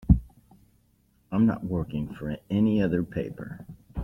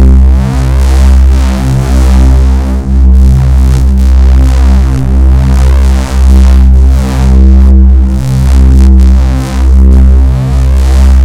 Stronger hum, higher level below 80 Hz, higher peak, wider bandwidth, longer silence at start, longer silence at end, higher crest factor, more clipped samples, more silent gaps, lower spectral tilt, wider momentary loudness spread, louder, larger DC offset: neither; second, -38 dBFS vs -4 dBFS; second, -6 dBFS vs 0 dBFS; second, 5.8 kHz vs 9.4 kHz; about the same, 0 s vs 0 s; about the same, 0 s vs 0 s; first, 20 dB vs 4 dB; second, under 0.1% vs 20%; neither; first, -10 dB/octave vs -7.5 dB/octave; first, 16 LU vs 5 LU; second, -27 LUFS vs -6 LUFS; neither